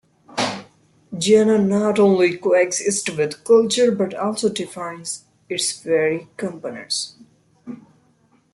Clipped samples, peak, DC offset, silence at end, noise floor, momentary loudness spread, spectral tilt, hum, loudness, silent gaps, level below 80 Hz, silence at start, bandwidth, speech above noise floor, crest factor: under 0.1%; -4 dBFS; under 0.1%; 0.8 s; -59 dBFS; 17 LU; -4 dB/octave; none; -19 LUFS; none; -64 dBFS; 0.3 s; 12 kHz; 40 dB; 16 dB